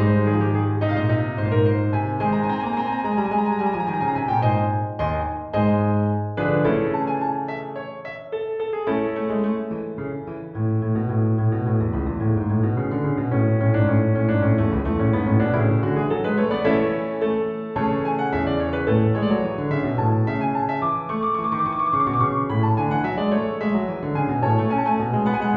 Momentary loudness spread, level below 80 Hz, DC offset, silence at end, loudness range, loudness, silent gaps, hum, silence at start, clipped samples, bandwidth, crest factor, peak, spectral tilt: 6 LU; -42 dBFS; under 0.1%; 0 s; 4 LU; -22 LUFS; none; none; 0 s; under 0.1%; 4.8 kHz; 14 dB; -6 dBFS; -10.5 dB/octave